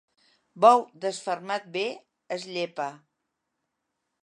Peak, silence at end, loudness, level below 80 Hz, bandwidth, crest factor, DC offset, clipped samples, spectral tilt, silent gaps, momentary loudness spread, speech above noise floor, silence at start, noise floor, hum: -4 dBFS; 1.25 s; -26 LUFS; -86 dBFS; 11 kHz; 24 dB; under 0.1%; under 0.1%; -3.5 dB/octave; none; 17 LU; 56 dB; 0.55 s; -81 dBFS; none